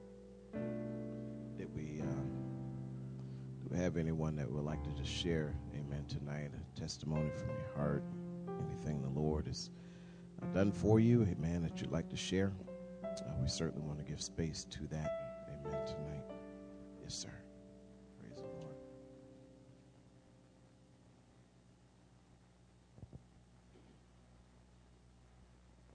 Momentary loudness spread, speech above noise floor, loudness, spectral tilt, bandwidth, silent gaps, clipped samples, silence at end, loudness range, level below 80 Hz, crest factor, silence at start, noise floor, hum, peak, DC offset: 19 LU; 27 dB; -41 LUFS; -6 dB/octave; 10 kHz; none; under 0.1%; 0 s; 16 LU; -56 dBFS; 24 dB; 0 s; -66 dBFS; 60 Hz at -65 dBFS; -18 dBFS; under 0.1%